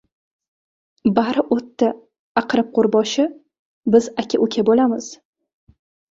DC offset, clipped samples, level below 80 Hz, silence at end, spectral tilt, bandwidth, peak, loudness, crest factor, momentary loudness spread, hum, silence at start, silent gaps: under 0.1%; under 0.1%; -60 dBFS; 0.95 s; -5.5 dB/octave; 7.8 kHz; -2 dBFS; -19 LUFS; 18 dB; 8 LU; none; 1.05 s; 2.19-2.35 s, 3.59-3.83 s